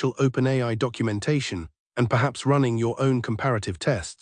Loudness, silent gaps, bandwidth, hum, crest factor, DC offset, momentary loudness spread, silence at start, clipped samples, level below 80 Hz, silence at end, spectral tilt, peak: -24 LUFS; 1.80-1.90 s; 10.5 kHz; none; 16 dB; under 0.1%; 5 LU; 0 s; under 0.1%; -54 dBFS; 0.1 s; -6.5 dB/octave; -8 dBFS